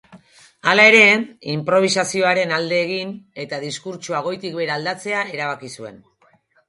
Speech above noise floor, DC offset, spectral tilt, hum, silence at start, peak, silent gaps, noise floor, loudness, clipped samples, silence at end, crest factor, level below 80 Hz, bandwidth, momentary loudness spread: 39 dB; under 0.1%; -3.5 dB/octave; none; 0.1 s; 0 dBFS; none; -58 dBFS; -17 LUFS; under 0.1%; 0.75 s; 20 dB; -68 dBFS; 11.5 kHz; 19 LU